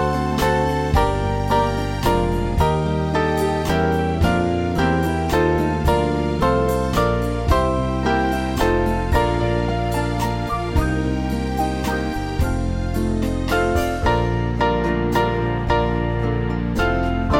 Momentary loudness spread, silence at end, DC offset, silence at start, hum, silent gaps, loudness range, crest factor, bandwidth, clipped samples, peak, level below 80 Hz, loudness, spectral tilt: 4 LU; 0 s; under 0.1%; 0 s; none; none; 3 LU; 16 dB; 17 kHz; under 0.1%; -2 dBFS; -26 dBFS; -20 LUFS; -6.5 dB/octave